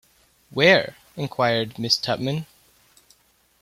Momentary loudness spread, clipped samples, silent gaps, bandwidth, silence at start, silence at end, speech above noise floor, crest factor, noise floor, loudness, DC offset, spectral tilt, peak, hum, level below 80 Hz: 17 LU; under 0.1%; none; 16 kHz; 0.55 s; 1.2 s; 40 dB; 22 dB; -61 dBFS; -21 LUFS; under 0.1%; -4.5 dB/octave; -2 dBFS; none; -60 dBFS